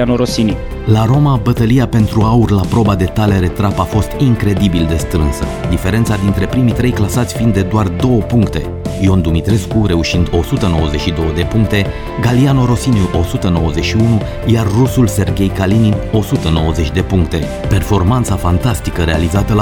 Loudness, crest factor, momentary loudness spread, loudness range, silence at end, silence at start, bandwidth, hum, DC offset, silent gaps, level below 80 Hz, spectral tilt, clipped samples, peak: -13 LUFS; 12 dB; 4 LU; 2 LU; 0 s; 0 s; 18.5 kHz; none; under 0.1%; none; -24 dBFS; -6.5 dB/octave; under 0.1%; 0 dBFS